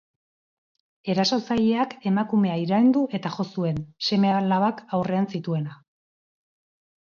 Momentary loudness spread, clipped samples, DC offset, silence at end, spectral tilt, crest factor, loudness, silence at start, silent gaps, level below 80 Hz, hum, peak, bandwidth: 8 LU; under 0.1%; under 0.1%; 1.35 s; -6.5 dB/octave; 14 dB; -24 LUFS; 1.05 s; none; -62 dBFS; none; -10 dBFS; 7 kHz